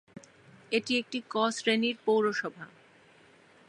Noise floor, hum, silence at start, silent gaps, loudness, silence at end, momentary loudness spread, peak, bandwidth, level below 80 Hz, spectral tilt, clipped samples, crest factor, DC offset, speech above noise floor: -59 dBFS; none; 0.15 s; none; -29 LUFS; 1 s; 12 LU; -12 dBFS; 11 kHz; -82 dBFS; -3.5 dB/octave; under 0.1%; 20 dB; under 0.1%; 30 dB